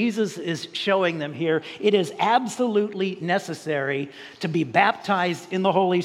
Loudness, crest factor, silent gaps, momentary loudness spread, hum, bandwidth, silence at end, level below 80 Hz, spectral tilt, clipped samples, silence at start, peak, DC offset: -23 LUFS; 20 dB; none; 7 LU; none; 13.5 kHz; 0 s; -76 dBFS; -5.5 dB/octave; under 0.1%; 0 s; -4 dBFS; under 0.1%